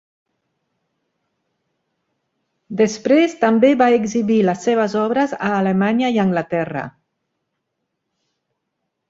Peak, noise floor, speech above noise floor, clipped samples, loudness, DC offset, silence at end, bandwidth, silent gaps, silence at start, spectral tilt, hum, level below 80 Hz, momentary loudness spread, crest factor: -2 dBFS; -76 dBFS; 60 dB; under 0.1%; -17 LUFS; under 0.1%; 2.2 s; 7.8 kHz; none; 2.7 s; -6 dB/octave; none; -62 dBFS; 8 LU; 18 dB